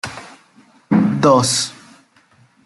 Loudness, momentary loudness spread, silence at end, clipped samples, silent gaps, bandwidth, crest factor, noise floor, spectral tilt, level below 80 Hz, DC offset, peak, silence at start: -15 LUFS; 17 LU; 0.95 s; under 0.1%; none; 12 kHz; 18 dB; -54 dBFS; -4.5 dB/octave; -58 dBFS; under 0.1%; -2 dBFS; 0.05 s